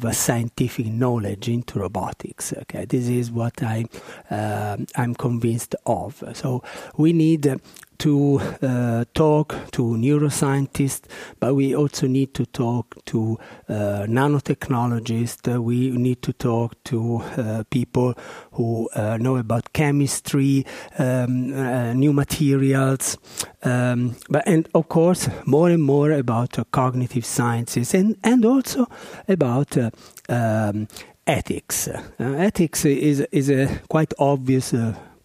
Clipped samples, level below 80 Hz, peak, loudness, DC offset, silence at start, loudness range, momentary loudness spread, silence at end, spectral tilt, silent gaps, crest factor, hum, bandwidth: under 0.1%; -50 dBFS; -2 dBFS; -22 LUFS; under 0.1%; 0 s; 5 LU; 9 LU; 0.2 s; -6 dB/octave; none; 18 dB; none; 15.5 kHz